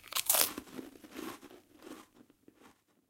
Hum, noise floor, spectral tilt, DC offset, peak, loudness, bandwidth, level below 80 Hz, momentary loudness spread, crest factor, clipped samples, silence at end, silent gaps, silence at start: none; -64 dBFS; 0 dB/octave; under 0.1%; -4 dBFS; -30 LUFS; 17 kHz; -74 dBFS; 25 LU; 34 dB; under 0.1%; 0.4 s; none; 0.05 s